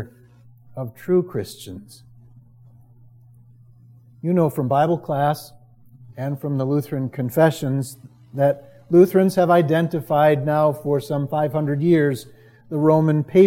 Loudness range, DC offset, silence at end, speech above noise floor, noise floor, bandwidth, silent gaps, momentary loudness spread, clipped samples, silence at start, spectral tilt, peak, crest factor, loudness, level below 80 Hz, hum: 11 LU; under 0.1%; 0 s; 30 dB; -49 dBFS; 16.5 kHz; none; 16 LU; under 0.1%; 0 s; -8 dB/octave; -2 dBFS; 18 dB; -20 LUFS; -62 dBFS; none